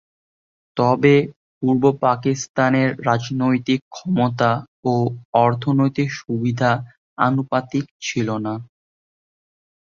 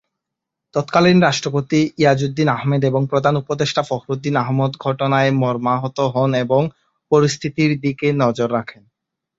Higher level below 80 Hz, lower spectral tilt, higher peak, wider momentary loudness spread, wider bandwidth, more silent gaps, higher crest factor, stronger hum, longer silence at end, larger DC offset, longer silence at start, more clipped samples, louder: about the same, -58 dBFS vs -56 dBFS; about the same, -6.5 dB/octave vs -6 dB/octave; about the same, -2 dBFS vs -2 dBFS; about the same, 8 LU vs 6 LU; about the same, 7.4 kHz vs 7.8 kHz; first, 1.36-1.61 s, 2.49-2.54 s, 3.82-3.91 s, 4.68-4.83 s, 5.25-5.33 s, 6.97-7.17 s, 7.91-8.00 s vs none; about the same, 18 dB vs 16 dB; neither; first, 1.35 s vs 0.65 s; neither; about the same, 0.75 s vs 0.75 s; neither; about the same, -20 LUFS vs -18 LUFS